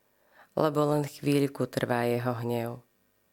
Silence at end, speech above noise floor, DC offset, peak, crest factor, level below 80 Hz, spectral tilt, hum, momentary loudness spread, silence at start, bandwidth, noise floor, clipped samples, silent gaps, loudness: 0.5 s; 33 dB; under 0.1%; -10 dBFS; 20 dB; -70 dBFS; -6.5 dB/octave; none; 8 LU; 0.55 s; 17 kHz; -61 dBFS; under 0.1%; none; -29 LUFS